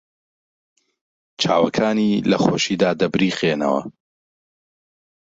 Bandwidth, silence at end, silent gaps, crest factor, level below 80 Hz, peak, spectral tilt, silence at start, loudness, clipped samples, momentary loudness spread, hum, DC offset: 7.8 kHz; 1.3 s; none; 18 dB; -58 dBFS; -2 dBFS; -5 dB/octave; 1.4 s; -19 LUFS; under 0.1%; 5 LU; none; under 0.1%